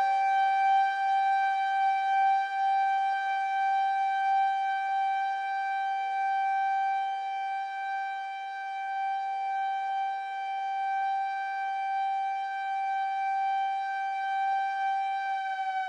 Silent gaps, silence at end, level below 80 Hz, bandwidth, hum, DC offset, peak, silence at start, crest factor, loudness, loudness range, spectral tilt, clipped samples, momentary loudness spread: none; 0 s; under -90 dBFS; 8.2 kHz; none; under 0.1%; -18 dBFS; 0 s; 10 dB; -29 LUFS; 5 LU; 3 dB/octave; under 0.1%; 7 LU